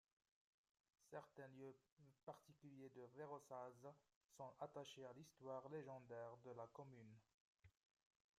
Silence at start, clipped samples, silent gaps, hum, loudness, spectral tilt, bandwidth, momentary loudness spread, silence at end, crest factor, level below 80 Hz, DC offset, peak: 1 s; under 0.1%; 1.92-1.97 s, 2.23-2.27 s, 4.16-4.29 s, 7.34-7.55 s; none; -60 LUFS; -5.5 dB/octave; 14.5 kHz; 8 LU; 0.7 s; 20 dB; under -90 dBFS; under 0.1%; -40 dBFS